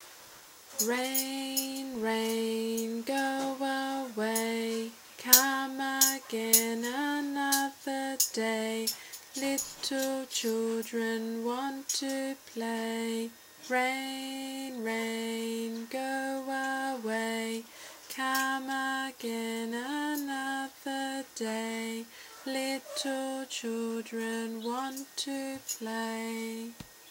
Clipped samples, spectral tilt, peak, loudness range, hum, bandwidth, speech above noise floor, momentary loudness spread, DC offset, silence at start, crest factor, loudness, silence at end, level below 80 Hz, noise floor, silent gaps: under 0.1%; -1.5 dB/octave; 0 dBFS; 9 LU; none; 16 kHz; 19 dB; 9 LU; under 0.1%; 0 s; 32 dB; -32 LUFS; 0 s; -78 dBFS; -52 dBFS; none